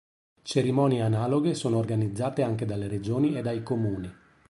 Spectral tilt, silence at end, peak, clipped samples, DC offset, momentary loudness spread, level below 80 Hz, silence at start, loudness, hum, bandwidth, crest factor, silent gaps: -7 dB/octave; 0.35 s; -10 dBFS; under 0.1%; under 0.1%; 7 LU; -56 dBFS; 0.45 s; -27 LUFS; none; 11.5 kHz; 16 dB; none